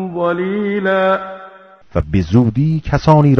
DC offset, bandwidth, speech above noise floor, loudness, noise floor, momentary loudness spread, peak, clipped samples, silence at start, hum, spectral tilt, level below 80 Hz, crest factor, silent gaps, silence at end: under 0.1%; 6.6 kHz; 26 dB; -16 LUFS; -39 dBFS; 10 LU; 0 dBFS; 0.2%; 0 s; none; -8.5 dB/octave; -32 dBFS; 14 dB; none; 0 s